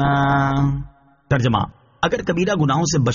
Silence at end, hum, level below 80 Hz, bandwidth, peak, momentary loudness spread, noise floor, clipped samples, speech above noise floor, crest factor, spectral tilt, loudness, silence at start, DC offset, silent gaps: 0 s; none; -40 dBFS; 7.4 kHz; -4 dBFS; 9 LU; -40 dBFS; under 0.1%; 22 dB; 14 dB; -5.5 dB/octave; -19 LUFS; 0 s; under 0.1%; none